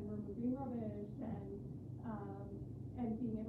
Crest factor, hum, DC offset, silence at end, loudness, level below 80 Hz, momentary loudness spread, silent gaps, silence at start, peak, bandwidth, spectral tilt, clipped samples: 14 dB; none; under 0.1%; 0 s; -45 LUFS; -62 dBFS; 8 LU; none; 0 s; -30 dBFS; 4.1 kHz; -11 dB/octave; under 0.1%